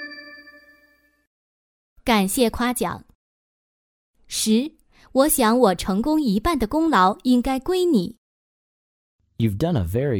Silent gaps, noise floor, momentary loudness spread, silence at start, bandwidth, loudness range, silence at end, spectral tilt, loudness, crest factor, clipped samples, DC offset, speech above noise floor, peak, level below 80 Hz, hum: 1.27-1.96 s, 3.15-4.14 s, 8.18-9.19 s; -60 dBFS; 13 LU; 0 s; over 20 kHz; 6 LU; 0 s; -5 dB/octave; -21 LUFS; 18 dB; under 0.1%; under 0.1%; 40 dB; -4 dBFS; -42 dBFS; none